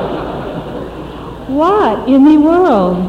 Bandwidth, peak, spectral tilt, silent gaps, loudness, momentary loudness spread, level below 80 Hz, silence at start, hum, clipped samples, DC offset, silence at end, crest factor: 7.4 kHz; 0 dBFS; -8 dB/octave; none; -11 LUFS; 19 LU; -36 dBFS; 0 s; none; under 0.1%; under 0.1%; 0 s; 10 dB